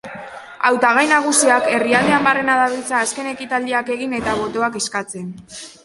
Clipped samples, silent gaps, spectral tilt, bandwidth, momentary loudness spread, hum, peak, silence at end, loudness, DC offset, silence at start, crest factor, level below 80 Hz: under 0.1%; none; -2.5 dB/octave; 12 kHz; 18 LU; none; 0 dBFS; 0.15 s; -17 LUFS; under 0.1%; 0.05 s; 18 dB; -54 dBFS